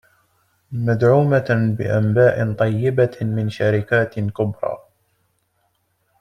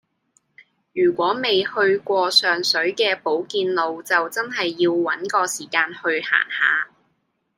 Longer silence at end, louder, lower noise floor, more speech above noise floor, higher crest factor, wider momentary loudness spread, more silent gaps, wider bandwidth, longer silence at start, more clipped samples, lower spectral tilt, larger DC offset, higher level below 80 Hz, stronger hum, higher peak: first, 1.45 s vs 0.7 s; about the same, -19 LUFS vs -20 LUFS; about the same, -67 dBFS vs -70 dBFS; about the same, 49 dB vs 49 dB; about the same, 16 dB vs 20 dB; about the same, 9 LU vs 7 LU; neither; second, 6.8 kHz vs 16.5 kHz; second, 0.7 s vs 0.95 s; neither; first, -9 dB/octave vs -2.5 dB/octave; neither; first, -54 dBFS vs -72 dBFS; neither; about the same, -2 dBFS vs -2 dBFS